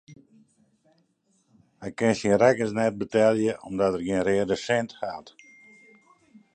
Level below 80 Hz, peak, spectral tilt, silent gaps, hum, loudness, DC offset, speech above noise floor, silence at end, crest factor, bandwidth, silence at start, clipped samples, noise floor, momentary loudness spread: -60 dBFS; -6 dBFS; -5.5 dB/octave; none; none; -24 LUFS; under 0.1%; 45 dB; 1.25 s; 22 dB; 9.6 kHz; 0.1 s; under 0.1%; -69 dBFS; 15 LU